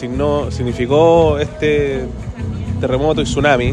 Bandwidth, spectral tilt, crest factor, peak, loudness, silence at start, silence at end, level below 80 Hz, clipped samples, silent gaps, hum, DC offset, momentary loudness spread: 10.5 kHz; -6.5 dB/octave; 14 dB; 0 dBFS; -16 LUFS; 0 s; 0 s; -30 dBFS; under 0.1%; none; none; under 0.1%; 13 LU